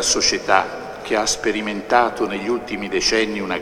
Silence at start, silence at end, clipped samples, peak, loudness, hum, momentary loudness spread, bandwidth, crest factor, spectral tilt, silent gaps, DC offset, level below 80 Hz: 0 s; 0 s; under 0.1%; 0 dBFS; -19 LUFS; none; 8 LU; 15.5 kHz; 20 dB; -2 dB/octave; none; under 0.1%; -46 dBFS